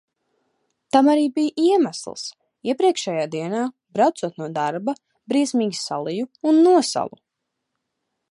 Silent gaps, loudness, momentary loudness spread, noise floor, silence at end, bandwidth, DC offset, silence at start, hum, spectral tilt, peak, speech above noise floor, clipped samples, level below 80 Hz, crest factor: none; -21 LUFS; 14 LU; -80 dBFS; 1.25 s; 11.5 kHz; under 0.1%; 0.95 s; none; -4.5 dB/octave; -2 dBFS; 60 dB; under 0.1%; -74 dBFS; 20 dB